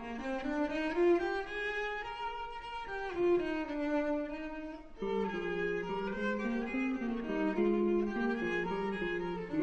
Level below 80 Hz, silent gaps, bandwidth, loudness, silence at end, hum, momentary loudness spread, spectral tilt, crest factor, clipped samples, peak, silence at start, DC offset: -54 dBFS; none; 8 kHz; -35 LUFS; 0 s; none; 9 LU; -6.5 dB/octave; 14 dB; under 0.1%; -20 dBFS; 0 s; under 0.1%